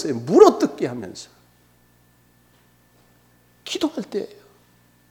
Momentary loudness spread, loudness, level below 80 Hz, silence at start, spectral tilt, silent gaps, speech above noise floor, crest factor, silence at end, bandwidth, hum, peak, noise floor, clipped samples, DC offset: 24 LU; -19 LUFS; -64 dBFS; 0 s; -5.5 dB/octave; none; 38 dB; 24 dB; 0.85 s; 16 kHz; 60 Hz at -60 dBFS; 0 dBFS; -57 dBFS; under 0.1%; under 0.1%